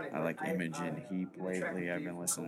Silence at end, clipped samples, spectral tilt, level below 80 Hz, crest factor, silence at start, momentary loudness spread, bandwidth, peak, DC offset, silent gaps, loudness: 0 s; under 0.1%; -4.5 dB/octave; -80 dBFS; 20 dB; 0 s; 4 LU; 16.5 kHz; -18 dBFS; under 0.1%; none; -37 LUFS